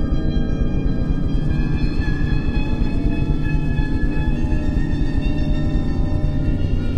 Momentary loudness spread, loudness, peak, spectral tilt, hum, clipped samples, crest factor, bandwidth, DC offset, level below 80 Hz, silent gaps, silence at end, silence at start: 1 LU; -22 LUFS; -6 dBFS; -8.5 dB/octave; none; under 0.1%; 12 dB; 6.6 kHz; under 0.1%; -20 dBFS; none; 0 s; 0 s